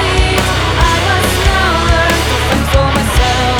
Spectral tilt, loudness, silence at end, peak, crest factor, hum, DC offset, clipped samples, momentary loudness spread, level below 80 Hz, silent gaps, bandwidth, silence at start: -4 dB/octave; -11 LUFS; 0 s; 0 dBFS; 12 dB; none; under 0.1%; under 0.1%; 2 LU; -16 dBFS; none; over 20 kHz; 0 s